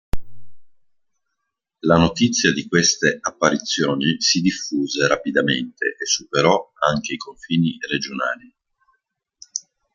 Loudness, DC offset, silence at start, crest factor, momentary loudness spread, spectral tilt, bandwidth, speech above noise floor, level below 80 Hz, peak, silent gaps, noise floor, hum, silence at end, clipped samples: -19 LUFS; under 0.1%; 0.15 s; 20 dB; 13 LU; -3.5 dB/octave; 11 kHz; 59 dB; -44 dBFS; 0 dBFS; none; -79 dBFS; none; 0.35 s; under 0.1%